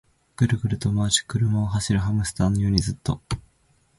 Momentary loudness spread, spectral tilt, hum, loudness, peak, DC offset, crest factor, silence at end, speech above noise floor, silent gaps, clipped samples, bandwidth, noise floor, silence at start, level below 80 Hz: 8 LU; -5 dB/octave; none; -24 LUFS; -4 dBFS; under 0.1%; 20 dB; 0.6 s; 40 dB; none; under 0.1%; 11.5 kHz; -63 dBFS; 0.4 s; -40 dBFS